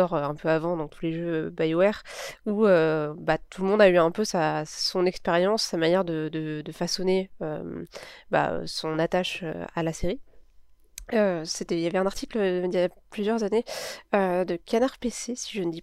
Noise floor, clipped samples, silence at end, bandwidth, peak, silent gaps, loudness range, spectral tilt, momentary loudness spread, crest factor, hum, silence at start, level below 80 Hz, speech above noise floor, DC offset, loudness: -53 dBFS; under 0.1%; 0 s; 14.5 kHz; -6 dBFS; none; 6 LU; -5 dB/octave; 11 LU; 18 dB; none; 0 s; -50 dBFS; 28 dB; under 0.1%; -26 LUFS